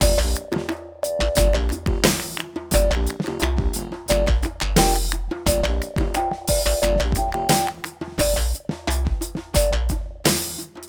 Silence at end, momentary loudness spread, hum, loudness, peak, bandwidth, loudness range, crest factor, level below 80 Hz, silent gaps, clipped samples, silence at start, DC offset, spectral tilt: 0 s; 8 LU; none; -22 LUFS; -2 dBFS; over 20 kHz; 1 LU; 20 dB; -24 dBFS; none; under 0.1%; 0 s; under 0.1%; -4 dB/octave